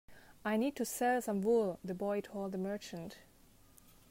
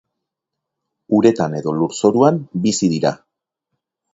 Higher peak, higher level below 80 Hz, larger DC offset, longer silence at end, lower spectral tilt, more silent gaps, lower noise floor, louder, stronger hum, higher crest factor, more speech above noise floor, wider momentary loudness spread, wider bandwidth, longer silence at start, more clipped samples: second, -22 dBFS vs 0 dBFS; second, -68 dBFS vs -58 dBFS; neither; about the same, 0.9 s vs 1 s; about the same, -5 dB/octave vs -6 dB/octave; neither; second, -63 dBFS vs -81 dBFS; second, -36 LUFS vs -17 LUFS; neither; about the same, 16 dB vs 18 dB; second, 28 dB vs 65 dB; first, 14 LU vs 7 LU; first, 16 kHz vs 8 kHz; second, 0.1 s vs 1.1 s; neither